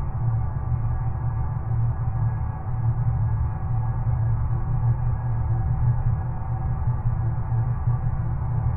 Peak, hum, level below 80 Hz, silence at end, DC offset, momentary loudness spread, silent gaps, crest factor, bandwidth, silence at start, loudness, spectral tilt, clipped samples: -12 dBFS; none; -30 dBFS; 0 s; under 0.1%; 3 LU; none; 12 dB; 2.5 kHz; 0 s; -26 LUFS; -13 dB/octave; under 0.1%